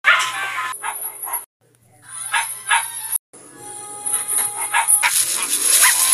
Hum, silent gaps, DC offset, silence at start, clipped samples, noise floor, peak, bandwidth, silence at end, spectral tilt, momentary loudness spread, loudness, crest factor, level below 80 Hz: none; 1.46-1.60 s, 3.19-3.33 s; under 0.1%; 0.05 s; under 0.1%; -48 dBFS; 0 dBFS; 15.5 kHz; 0 s; 2.5 dB/octave; 17 LU; -17 LUFS; 20 dB; -74 dBFS